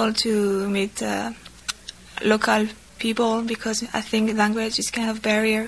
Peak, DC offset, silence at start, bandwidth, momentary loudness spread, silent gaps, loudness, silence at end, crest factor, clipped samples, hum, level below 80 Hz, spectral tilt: -4 dBFS; 0.1%; 0 s; 11 kHz; 11 LU; none; -23 LUFS; 0 s; 20 dB; under 0.1%; none; -52 dBFS; -3.5 dB/octave